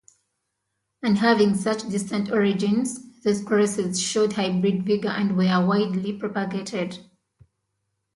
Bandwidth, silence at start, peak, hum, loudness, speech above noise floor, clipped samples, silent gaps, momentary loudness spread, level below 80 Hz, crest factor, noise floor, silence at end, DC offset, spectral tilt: 11.5 kHz; 1.05 s; -6 dBFS; none; -23 LUFS; 56 dB; under 0.1%; none; 8 LU; -66 dBFS; 18 dB; -78 dBFS; 1.15 s; under 0.1%; -5.5 dB/octave